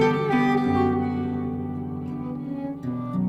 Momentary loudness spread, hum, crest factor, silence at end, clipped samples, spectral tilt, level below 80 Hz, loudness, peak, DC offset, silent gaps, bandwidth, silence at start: 10 LU; none; 16 dB; 0 s; under 0.1%; -8 dB/octave; -54 dBFS; -25 LUFS; -10 dBFS; under 0.1%; none; 8 kHz; 0 s